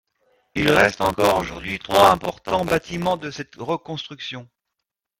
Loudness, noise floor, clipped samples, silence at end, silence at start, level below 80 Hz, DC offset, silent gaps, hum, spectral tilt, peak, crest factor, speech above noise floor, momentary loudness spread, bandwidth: -20 LUFS; -82 dBFS; under 0.1%; 0.75 s; 0.55 s; -48 dBFS; under 0.1%; none; none; -4.5 dB/octave; 0 dBFS; 22 dB; 62 dB; 16 LU; 16.5 kHz